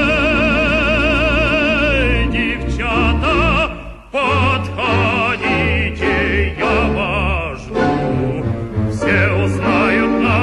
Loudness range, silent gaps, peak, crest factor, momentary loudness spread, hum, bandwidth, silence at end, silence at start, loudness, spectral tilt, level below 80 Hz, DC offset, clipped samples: 2 LU; none; -4 dBFS; 12 dB; 6 LU; none; 11 kHz; 0 s; 0 s; -15 LUFS; -6.5 dB/octave; -24 dBFS; under 0.1%; under 0.1%